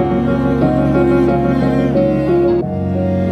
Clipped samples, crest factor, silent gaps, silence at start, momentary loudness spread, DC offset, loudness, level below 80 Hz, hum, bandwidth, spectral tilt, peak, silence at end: under 0.1%; 12 dB; none; 0 s; 4 LU; under 0.1%; -14 LUFS; -30 dBFS; none; 8 kHz; -9.5 dB/octave; -2 dBFS; 0 s